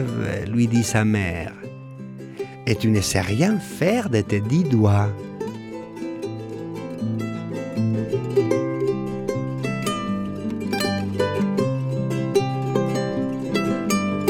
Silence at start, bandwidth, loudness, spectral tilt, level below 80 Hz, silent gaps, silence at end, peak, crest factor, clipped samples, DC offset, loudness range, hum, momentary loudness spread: 0 s; 16.5 kHz; -23 LUFS; -6 dB/octave; -50 dBFS; none; 0 s; -4 dBFS; 18 dB; under 0.1%; under 0.1%; 4 LU; none; 12 LU